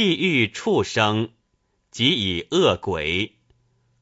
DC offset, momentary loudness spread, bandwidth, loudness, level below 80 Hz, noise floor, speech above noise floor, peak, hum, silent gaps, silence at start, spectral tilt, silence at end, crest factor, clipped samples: under 0.1%; 8 LU; 8 kHz; -21 LUFS; -52 dBFS; -70 dBFS; 48 dB; -4 dBFS; none; none; 0 s; -4.5 dB/octave; 0.75 s; 18 dB; under 0.1%